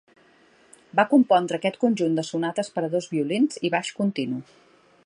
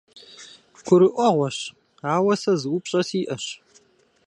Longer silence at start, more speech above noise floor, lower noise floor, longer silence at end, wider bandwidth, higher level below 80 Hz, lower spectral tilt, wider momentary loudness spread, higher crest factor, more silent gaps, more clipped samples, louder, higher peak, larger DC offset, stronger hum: first, 0.95 s vs 0.15 s; second, 34 dB vs 38 dB; about the same, -57 dBFS vs -59 dBFS; about the same, 0.65 s vs 0.7 s; about the same, 11 kHz vs 10.5 kHz; second, -74 dBFS vs -68 dBFS; about the same, -5.5 dB/octave vs -5.5 dB/octave; second, 8 LU vs 23 LU; about the same, 20 dB vs 20 dB; neither; neither; about the same, -24 LUFS vs -22 LUFS; about the same, -4 dBFS vs -4 dBFS; neither; neither